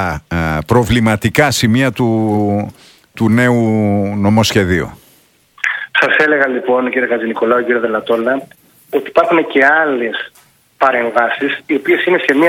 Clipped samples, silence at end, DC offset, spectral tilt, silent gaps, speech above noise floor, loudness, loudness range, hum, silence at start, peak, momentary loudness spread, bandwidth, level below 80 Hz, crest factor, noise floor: 0.1%; 0 s; under 0.1%; -5.5 dB/octave; none; 38 dB; -13 LUFS; 1 LU; none; 0 s; 0 dBFS; 8 LU; 17 kHz; -40 dBFS; 14 dB; -51 dBFS